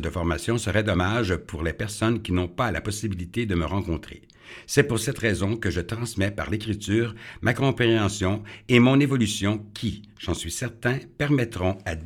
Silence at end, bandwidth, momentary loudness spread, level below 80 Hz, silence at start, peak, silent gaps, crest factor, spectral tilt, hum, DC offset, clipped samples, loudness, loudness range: 0 s; 17 kHz; 9 LU; -42 dBFS; 0 s; -2 dBFS; none; 22 dB; -5.5 dB/octave; none; under 0.1%; under 0.1%; -25 LUFS; 4 LU